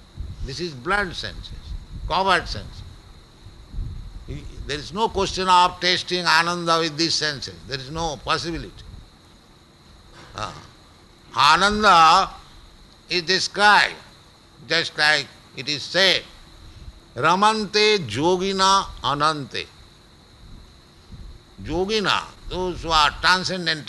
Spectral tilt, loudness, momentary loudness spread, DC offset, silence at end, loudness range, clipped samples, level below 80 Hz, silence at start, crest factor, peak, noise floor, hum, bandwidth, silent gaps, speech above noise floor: -3 dB/octave; -20 LUFS; 21 LU; under 0.1%; 0 s; 9 LU; under 0.1%; -42 dBFS; 0.15 s; 20 dB; -4 dBFS; -51 dBFS; none; 12 kHz; none; 30 dB